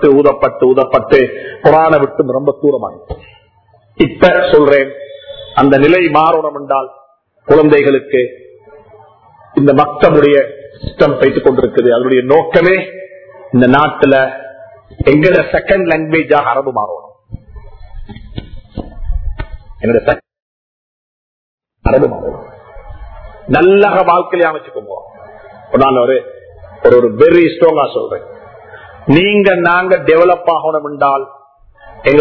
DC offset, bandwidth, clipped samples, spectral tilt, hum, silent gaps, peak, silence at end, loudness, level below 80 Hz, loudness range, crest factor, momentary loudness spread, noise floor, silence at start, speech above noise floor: under 0.1%; 6 kHz; 0.6%; -8.5 dB/octave; none; 20.42-21.58 s; 0 dBFS; 0 s; -10 LUFS; -32 dBFS; 9 LU; 12 dB; 20 LU; -49 dBFS; 0 s; 40 dB